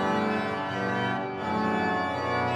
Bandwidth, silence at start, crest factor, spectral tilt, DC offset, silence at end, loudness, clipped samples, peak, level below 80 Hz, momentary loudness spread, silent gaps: 12 kHz; 0 s; 14 dB; -6 dB/octave; under 0.1%; 0 s; -28 LUFS; under 0.1%; -12 dBFS; -62 dBFS; 4 LU; none